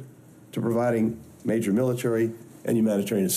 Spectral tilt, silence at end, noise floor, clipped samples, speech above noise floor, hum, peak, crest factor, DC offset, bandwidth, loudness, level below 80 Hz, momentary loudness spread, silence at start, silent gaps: -6 dB/octave; 0 s; -49 dBFS; under 0.1%; 24 dB; none; -12 dBFS; 12 dB; under 0.1%; 15 kHz; -26 LUFS; -64 dBFS; 8 LU; 0 s; none